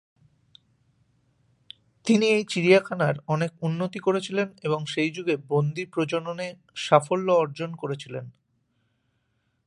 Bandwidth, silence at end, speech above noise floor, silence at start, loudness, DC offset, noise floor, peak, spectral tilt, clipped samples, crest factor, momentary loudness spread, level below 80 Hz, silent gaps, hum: 11.5 kHz; 1.35 s; 48 dB; 2.05 s; -25 LUFS; under 0.1%; -73 dBFS; -2 dBFS; -6 dB/octave; under 0.1%; 24 dB; 13 LU; -72 dBFS; none; none